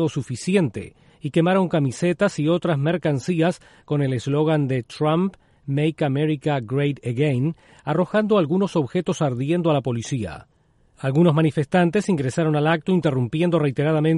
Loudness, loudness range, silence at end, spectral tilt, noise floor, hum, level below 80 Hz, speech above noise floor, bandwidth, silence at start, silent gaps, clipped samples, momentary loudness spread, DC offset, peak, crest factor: -22 LUFS; 2 LU; 0 s; -7 dB/octave; -58 dBFS; none; -56 dBFS; 38 dB; 11.5 kHz; 0 s; none; under 0.1%; 8 LU; under 0.1%; -6 dBFS; 16 dB